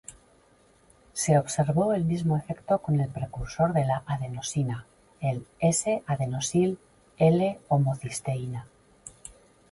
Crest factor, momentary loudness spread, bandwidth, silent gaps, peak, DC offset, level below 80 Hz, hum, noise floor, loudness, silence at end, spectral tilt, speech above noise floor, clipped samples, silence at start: 18 dB; 16 LU; 11.5 kHz; none; -8 dBFS; under 0.1%; -54 dBFS; none; -61 dBFS; -27 LUFS; 0.45 s; -6 dB/octave; 35 dB; under 0.1%; 0.1 s